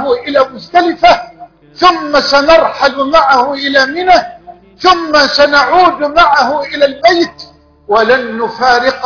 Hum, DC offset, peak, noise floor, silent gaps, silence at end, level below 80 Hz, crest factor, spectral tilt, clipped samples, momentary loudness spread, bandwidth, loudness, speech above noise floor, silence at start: none; under 0.1%; 0 dBFS; -35 dBFS; none; 0 s; -40 dBFS; 10 dB; -3 dB/octave; 0.7%; 6 LU; 5.4 kHz; -9 LUFS; 26 dB; 0 s